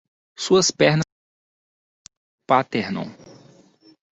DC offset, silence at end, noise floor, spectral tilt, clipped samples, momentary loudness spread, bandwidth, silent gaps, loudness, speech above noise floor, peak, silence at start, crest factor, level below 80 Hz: under 0.1%; 1 s; -53 dBFS; -4 dB/octave; under 0.1%; 14 LU; 8.4 kHz; 1.12-2.05 s, 2.17-2.38 s; -20 LUFS; 34 dB; -2 dBFS; 0.4 s; 22 dB; -62 dBFS